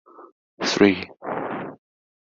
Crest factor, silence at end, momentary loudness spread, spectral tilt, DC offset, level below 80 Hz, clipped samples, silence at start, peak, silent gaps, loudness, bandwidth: 22 dB; 0.5 s; 15 LU; -4.5 dB/octave; under 0.1%; -58 dBFS; under 0.1%; 0.2 s; -4 dBFS; 0.32-0.58 s; -23 LUFS; 7.8 kHz